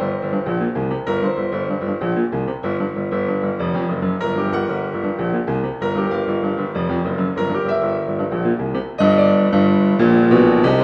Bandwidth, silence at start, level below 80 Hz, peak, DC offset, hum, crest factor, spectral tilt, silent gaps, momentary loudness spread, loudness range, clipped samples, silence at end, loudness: 6.2 kHz; 0 s; -50 dBFS; 0 dBFS; under 0.1%; none; 18 dB; -9 dB/octave; none; 9 LU; 5 LU; under 0.1%; 0 s; -19 LUFS